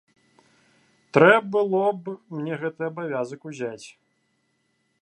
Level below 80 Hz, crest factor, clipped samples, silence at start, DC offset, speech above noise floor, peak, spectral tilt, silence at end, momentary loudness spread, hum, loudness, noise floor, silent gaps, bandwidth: -76 dBFS; 24 dB; under 0.1%; 1.15 s; under 0.1%; 48 dB; -2 dBFS; -6.5 dB/octave; 1.15 s; 17 LU; none; -23 LUFS; -71 dBFS; none; 10.5 kHz